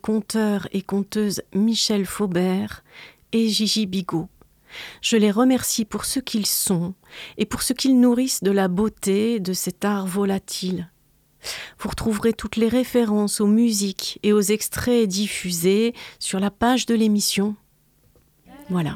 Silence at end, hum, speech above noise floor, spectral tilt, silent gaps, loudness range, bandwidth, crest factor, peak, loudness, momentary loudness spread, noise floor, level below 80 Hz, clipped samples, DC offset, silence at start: 0 s; none; 39 dB; -4.5 dB/octave; none; 4 LU; 17.5 kHz; 18 dB; -4 dBFS; -21 LUFS; 12 LU; -60 dBFS; -50 dBFS; under 0.1%; under 0.1%; 0.05 s